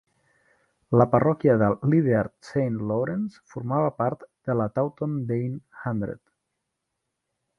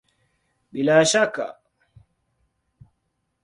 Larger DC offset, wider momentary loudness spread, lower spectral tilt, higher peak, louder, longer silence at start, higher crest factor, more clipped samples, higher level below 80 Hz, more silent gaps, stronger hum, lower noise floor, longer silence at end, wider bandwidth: neither; second, 13 LU vs 17 LU; first, -10 dB/octave vs -3.5 dB/octave; about the same, -4 dBFS vs -4 dBFS; second, -25 LUFS vs -19 LUFS; first, 0.9 s vs 0.75 s; about the same, 22 dB vs 20 dB; neither; first, -58 dBFS vs -66 dBFS; neither; neither; first, -81 dBFS vs -74 dBFS; second, 1.4 s vs 1.9 s; second, 7.2 kHz vs 11.5 kHz